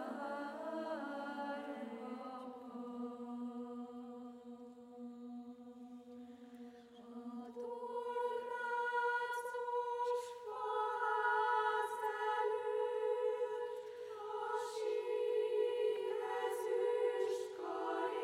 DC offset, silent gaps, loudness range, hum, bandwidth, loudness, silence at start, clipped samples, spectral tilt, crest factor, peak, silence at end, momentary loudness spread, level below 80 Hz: under 0.1%; none; 13 LU; none; 15.5 kHz; -40 LUFS; 0 s; under 0.1%; -3.5 dB/octave; 16 dB; -24 dBFS; 0 s; 18 LU; -90 dBFS